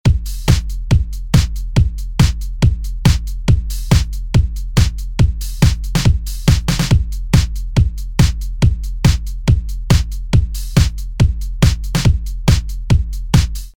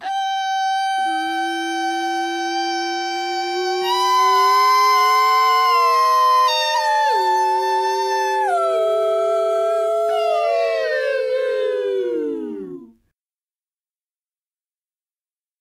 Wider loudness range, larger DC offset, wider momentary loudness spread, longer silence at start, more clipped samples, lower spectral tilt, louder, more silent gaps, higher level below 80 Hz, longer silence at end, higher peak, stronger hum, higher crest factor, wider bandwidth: second, 1 LU vs 10 LU; neither; second, 2 LU vs 8 LU; about the same, 0.05 s vs 0 s; neither; first, -5.5 dB/octave vs -1 dB/octave; about the same, -17 LUFS vs -18 LUFS; neither; first, -18 dBFS vs -68 dBFS; second, 0.1 s vs 2.75 s; first, 0 dBFS vs -6 dBFS; neither; about the same, 14 dB vs 12 dB; first, 18.5 kHz vs 15 kHz